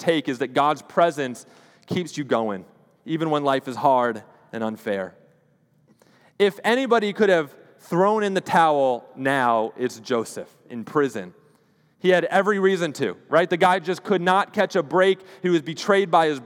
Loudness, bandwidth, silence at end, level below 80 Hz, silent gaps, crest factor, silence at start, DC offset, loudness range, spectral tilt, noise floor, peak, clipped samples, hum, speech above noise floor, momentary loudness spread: -22 LUFS; 16.5 kHz; 0 s; -76 dBFS; none; 20 dB; 0 s; under 0.1%; 5 LU; -5.5 dB/octave; -62 dBFS; -4 dBFS; under 0.1%; none; 40 dB; 11 LU